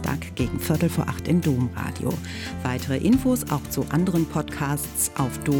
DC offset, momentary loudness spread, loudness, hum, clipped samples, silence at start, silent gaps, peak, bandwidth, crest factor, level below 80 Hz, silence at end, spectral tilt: under 0.1%; 7 LU; -24 LUFS; none; under 0.1%; 0 s; none; -10 dBFS; 18 kHz; 14 dB; -42 dBFS; 0 s; -5.5 dB/octave